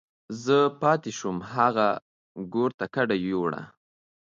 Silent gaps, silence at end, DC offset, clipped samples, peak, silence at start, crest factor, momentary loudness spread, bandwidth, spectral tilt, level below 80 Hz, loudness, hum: 2.02-2.35 s, 2.74-2.78 s; 0.55 s; under 0.1%; under 0.1%; -8 dBFS; 0.3 s; 20 dB; 14 LU; 7.6 kHz; -5.5 dB/octave; -66 dBFS; -26 LUFS; none